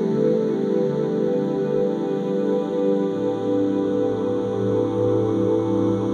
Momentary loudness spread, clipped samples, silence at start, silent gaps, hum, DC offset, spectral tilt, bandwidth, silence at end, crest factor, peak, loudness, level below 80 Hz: 3 LU; under 0.1%; 0 s; none; none; under 0.1%; -9 dB/octave; 9 kHz; 0 s; 12 dB; -10 dBFS; -22 LUFS; -58 dBFS